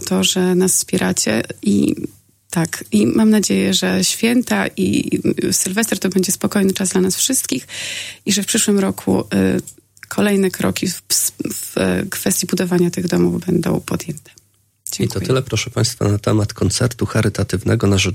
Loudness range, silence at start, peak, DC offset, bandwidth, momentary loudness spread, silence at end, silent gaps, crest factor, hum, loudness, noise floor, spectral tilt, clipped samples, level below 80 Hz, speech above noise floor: 3 LU; 0 s; 0 dBFS; under 0.1%; 16.5 kHz; 8 LU; 0 s; none; 16 dB; none; -17 LUFS; -40 dBFS; -4 dB/octave; under 0.1%; -48 dBFS; 23 dB